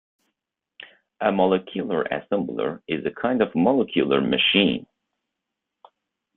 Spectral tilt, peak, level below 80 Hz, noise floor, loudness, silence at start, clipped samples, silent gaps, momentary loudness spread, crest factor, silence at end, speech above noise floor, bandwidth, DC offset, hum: -9.5 dB/octave; -4 dBFS; -62 dBFS; -83 dBFS; -22 LUFS; 0.8 s; under 0.1%; none; 9 LU; 20 dB; 1.55 s; 61 dB; 4.2 kHz; under 0.1%; none